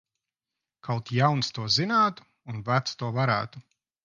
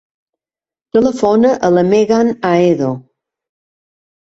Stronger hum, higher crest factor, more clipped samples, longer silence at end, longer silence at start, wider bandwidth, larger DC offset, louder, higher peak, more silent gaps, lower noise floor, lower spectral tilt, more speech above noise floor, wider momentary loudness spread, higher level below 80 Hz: neither; first, 20 dB vs 14 dB; neither; second, 0.45 s vs 1.25 s; about the same, 0.85 s vs 0.95 s; about the same, 7.4 kHz vs 8 kHz; neither; second, -26 LUFS vs -13 LUFS; second, -8 dBFS vs 0 dBFS; neither; about the same, -88 dBFS vs under -90 dBFS; second, -5 dB/octave vs -7 dB/octave; second, 62 dB vs over 78 dB; first, 16 LU vs 6 LU; second, -64 dBFS vs -52 dBFS